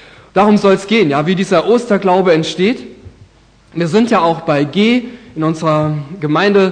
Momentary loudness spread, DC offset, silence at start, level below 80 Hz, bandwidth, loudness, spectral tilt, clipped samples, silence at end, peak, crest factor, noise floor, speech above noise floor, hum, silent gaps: 8 LU; under 0.1%; 0.35 s; -50 dBFS; 9.8 kHz; -13 LUFS; -6.5 dB/octave; under 0.1%; 0 s; 0 dBFS; 12 dB; -46 dBFS; 34 dB; none; none